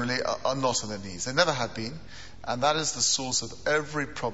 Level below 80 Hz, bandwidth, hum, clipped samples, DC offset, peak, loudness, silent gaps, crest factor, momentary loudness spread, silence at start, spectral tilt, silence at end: -54 dBFS; 8.2 kHz; none; under 0.1%; 0.7%; -6 dBFS; -27 LUFS; none; 24 dB; 12 LU; 0 s; -2.5 dB/octave; 0 s